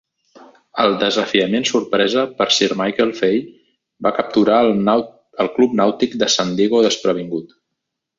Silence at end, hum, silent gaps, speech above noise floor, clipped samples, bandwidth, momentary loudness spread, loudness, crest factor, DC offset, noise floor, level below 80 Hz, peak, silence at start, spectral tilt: 0.75 s; none; none; 62 dB; under 0.1%; 7.8 kHz; 8 LU; -17 LUFS; 16 dB; under 0.1%; -78 dBFS; -58 dBFS; -2 dBFS; 0.75 s; -4 dB/octave